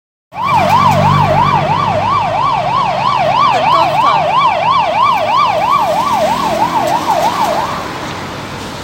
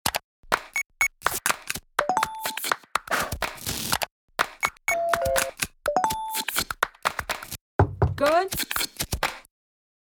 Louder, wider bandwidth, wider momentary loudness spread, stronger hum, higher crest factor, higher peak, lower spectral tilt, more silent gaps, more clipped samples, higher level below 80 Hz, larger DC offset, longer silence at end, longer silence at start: first, -12 LUFS vs -26 LUFS; second, 17 kHz vs over 20 kHz; first, 10 LU vs 6 LU; neither; second, 12 dB vs 26 dB; about the same, 0 dBFS vs 0 dBFS; first, -5 dB/octave vs -3 dB/octave; second, none vs 0.24-0.43 s, 4.11-4.28 s, 7.61-7.79 s; neither; about the same, -40 dBFS vs -44 dBFS; neither; second, 0 s vs 0.7 s; first, 0.35 s vs 0.05 s